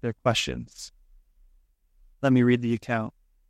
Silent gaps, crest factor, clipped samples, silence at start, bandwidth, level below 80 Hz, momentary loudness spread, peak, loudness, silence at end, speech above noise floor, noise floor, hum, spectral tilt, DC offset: none; 18 dB; under 0.1%; 0.05 s; 13.5 kHz; -54 dBFS; 20 LU; -10 dBFS; -25 LUFS; 0.4 s; 37 dB; -62 dBFS; none; -5.5 dB/octave; under 0.1%